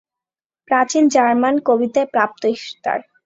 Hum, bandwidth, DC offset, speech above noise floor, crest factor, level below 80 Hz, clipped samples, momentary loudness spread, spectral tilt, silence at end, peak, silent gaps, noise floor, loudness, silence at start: none; 8 kHz; under 0.1%; 73 dB; 16 dB; -66 dBFS; under 0.1%; 9 LU; -3.5 dB/octave; 0.25 s; -2 dBFS; none; -89 dBFS; -17 LUFS; 0.7 s